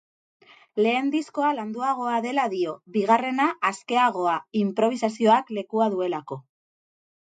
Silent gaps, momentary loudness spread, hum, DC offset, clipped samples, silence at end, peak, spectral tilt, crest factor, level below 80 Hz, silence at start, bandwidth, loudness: none; 8 LU; none; under 0.1%; under 0.1%; 0.8 s; -4 dBFS; -5.5 dB/octave; 20 dB; -76 dBFS; 0.75 s; 9.2 kHz; -24 LUFS